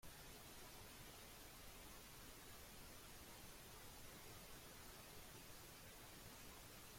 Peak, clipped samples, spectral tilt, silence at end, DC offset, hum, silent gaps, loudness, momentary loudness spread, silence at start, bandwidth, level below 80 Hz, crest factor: -44 dBFS; under 0.1%; -2.5 dB/octave; 0 s; under 0.1%; none; none; -59 LUFS; 1 LU; 0 s; 16.5 kHz; -68 dBFS; 14 dB